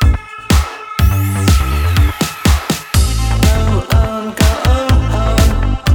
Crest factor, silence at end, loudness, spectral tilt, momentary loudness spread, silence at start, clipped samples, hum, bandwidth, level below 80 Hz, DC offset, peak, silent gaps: 12 dB; 0 s; -14 LUFS; -5 dB/octave; 3 LU; 0 s; under 0.1%; none; 18 kHz; -16 dBFS; under 0.1%; 0 dBFS; none